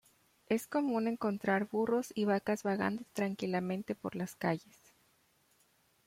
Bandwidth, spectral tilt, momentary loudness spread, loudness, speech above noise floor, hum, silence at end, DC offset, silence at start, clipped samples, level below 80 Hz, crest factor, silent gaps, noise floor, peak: 16.5 kHz; -6 dB/octave; 6 LU; -35 LUFS; 37 dB; none; 1.45 s; under 0.1%; 0.5 s; under 0.1%; -76 dBFS; 18 dB; none; -72 dBFS; -18 dBFS